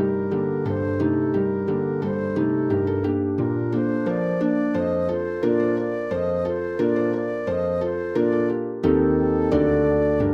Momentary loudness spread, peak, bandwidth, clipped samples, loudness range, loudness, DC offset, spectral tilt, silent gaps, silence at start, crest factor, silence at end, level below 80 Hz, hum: 5 LU; -8 dBFS; 6.6 kHz; under 0.1%; 2 LU; -23 LUFS; under 0.1%; -10 dB/octave; none; 0 s; 14 dB; 0 s; -44 dBFS; none